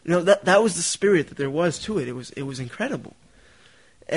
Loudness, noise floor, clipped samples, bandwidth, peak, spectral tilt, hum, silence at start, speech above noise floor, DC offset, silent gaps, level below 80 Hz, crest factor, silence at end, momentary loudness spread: -22 LUFS; -55 dBFS; under 0.1%; 11 kHz; -6 dBFS; -4 dB/octave; none; 0.05 s; 33 dB; 0.1%; none; -58 dBFS; 18 dB; 0 s; 14 LU